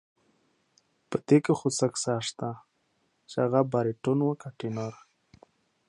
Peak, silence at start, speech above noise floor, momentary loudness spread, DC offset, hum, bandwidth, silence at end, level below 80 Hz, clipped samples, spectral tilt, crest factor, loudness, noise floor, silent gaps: -10 dBFS; 1.1 s; 46 dB; 13 LU; under 0.1%; none; 11 kHz; 0.95 s; -72 dBFS; under 0.1%; -5.5 dB/octave; 20 dB; -28 LUFS; -73 dBFS; none